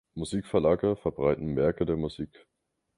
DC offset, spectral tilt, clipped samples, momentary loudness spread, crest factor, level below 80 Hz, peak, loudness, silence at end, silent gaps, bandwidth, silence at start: under 0.1%; -7.5 dB/octave; under 0.1%; 9 LU; 18 dB; -50 dBFS; -10 dBFS; -28 LUFS; 0.7 s; none; 11.5 kHz; 0.15 s